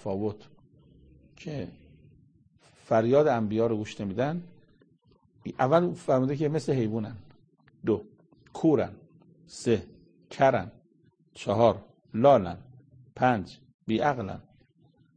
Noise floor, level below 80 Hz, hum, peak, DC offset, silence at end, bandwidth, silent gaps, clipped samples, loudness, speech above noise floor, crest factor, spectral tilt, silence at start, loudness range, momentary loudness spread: -64 dBFS; -62 dBFS; none; -8 dBFS; under 0.1%; 0.75 s; 9.8 kHz; 13.74-13.79 s; under 0.1%; -27 LUFS; 38 dB; 22 dB; -7 dB/octave; 0.05 s; 4 LU; 20 LU